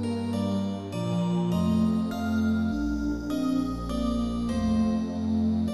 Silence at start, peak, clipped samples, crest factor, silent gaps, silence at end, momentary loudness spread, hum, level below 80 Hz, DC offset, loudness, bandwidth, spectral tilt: 0 s; -14 dBFS; under 0.1%; 12 dB; none; 0 s; 5 LU; none; -40 dBFS; 0.2%; -27 LUFS; 12.5 kHz; -7.5 dB/octave